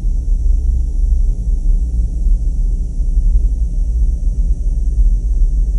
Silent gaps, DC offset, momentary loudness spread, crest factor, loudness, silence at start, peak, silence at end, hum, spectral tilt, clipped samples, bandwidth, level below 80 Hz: none; under 0.1%; 3 LU; 10 dB; -19 LUFS; 0 s; -2 dBFS; 0 s; none; -9 dB/octave; under 0.1%; 6.2 kHz; -14 dBFS